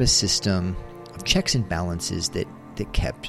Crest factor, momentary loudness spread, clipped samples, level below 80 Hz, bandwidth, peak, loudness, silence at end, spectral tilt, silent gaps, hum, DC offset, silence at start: 20 dB; 14 LU; under 0.1%; -34 dBFS; 14 kHz; -4 dBFS; -24 LUFS; 0 s; -3.5 dB/octave; none; none; under 0.1%; 0 s